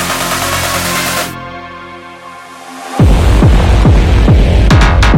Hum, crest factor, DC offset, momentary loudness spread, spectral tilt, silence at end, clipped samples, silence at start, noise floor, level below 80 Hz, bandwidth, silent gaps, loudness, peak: none; 10 dB; under 0.1%; 21 LU; -5 dB/octave; 0 s; under 0.1%; 0 s; -30 dBFS; -12 dBFS; 17 kHz; none; -10 LUFS; 0 dBFS